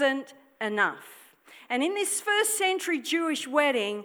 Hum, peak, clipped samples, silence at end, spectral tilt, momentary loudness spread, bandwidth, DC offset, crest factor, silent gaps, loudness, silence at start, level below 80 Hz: none; -8 dBFS; under 0.1%; 0 s; -1.5 dB/octave; 8 LU; over 20 kHz; under 0.1%; 20 dB; none; -26 LUFS; 0 s; -90 dBFS